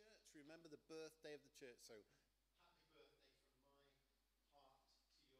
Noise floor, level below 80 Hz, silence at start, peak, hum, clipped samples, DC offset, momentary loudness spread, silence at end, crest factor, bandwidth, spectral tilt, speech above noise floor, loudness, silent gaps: -86 dBFS; -90 dBFS; 0 s; -46 dBFS; none; under 0.1%; under 0.1%; 8 LU; 0 s; 20 dB; 14.5 kHz; -3.5 dB/octave; 24 dB; -62 LUFS; none